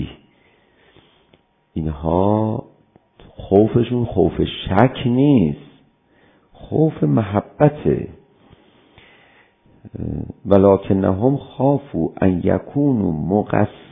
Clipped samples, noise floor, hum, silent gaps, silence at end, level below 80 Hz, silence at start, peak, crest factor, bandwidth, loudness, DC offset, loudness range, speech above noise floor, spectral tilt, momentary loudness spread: under 0.1%; -58 dBFS; none; none; 0.15 s; -40 dBFS; 0 s; 0 dBFS; 20 dB; 3.8 kHz; -18 LUFS; under 0.1%; 5 LU; 40 dB; -11.5 dB/octave; 13 LU